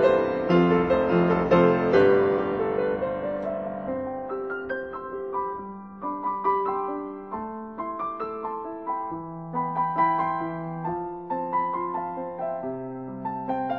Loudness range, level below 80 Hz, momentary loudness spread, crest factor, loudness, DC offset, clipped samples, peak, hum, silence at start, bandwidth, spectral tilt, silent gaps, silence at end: 9 LU; -54 dBFS; 14 LU; 18 dB; -26 LUFS; under 0.1%; under 0.1%; -6 dBFS; none; 0 s; 6.4 kHz; -9 dB/octave; none; 0 s